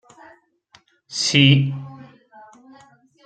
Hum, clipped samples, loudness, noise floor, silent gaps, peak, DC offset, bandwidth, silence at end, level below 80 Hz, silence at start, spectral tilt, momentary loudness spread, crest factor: none; under 0.1%; -17 LUFS; -56 dBFS; none; 0 dBFS; under 0.1%; 9.2 kHz; 1.25 s; -58 dBFS; 1.1 s; -4.5 dB/octave; 20 LU; 22 dB